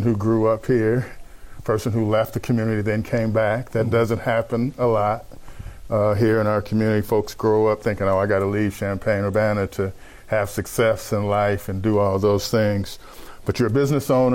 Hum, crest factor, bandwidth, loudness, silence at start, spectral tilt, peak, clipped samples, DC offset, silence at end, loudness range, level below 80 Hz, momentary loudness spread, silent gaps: none; 12 dB; 16.5 kHz; -21 LUFS; 0 s; -7 dB/octave; -10 dBFS; under 0.1%; under 0.1%; 0 s; 2 LU; -44 dBFS; 7 LU; none